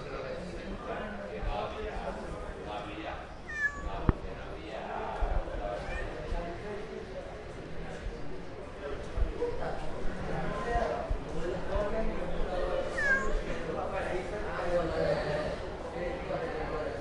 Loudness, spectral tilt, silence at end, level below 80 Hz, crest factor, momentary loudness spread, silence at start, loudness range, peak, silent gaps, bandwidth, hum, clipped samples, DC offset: -36 LUFS; -6 dB/octave; 0 s; -40 dBFS; 28 dB; 11 LU; 0 s; 7 LU; -6 dBFS; none; 11 kHz; none; under 0.1%; under 0.1%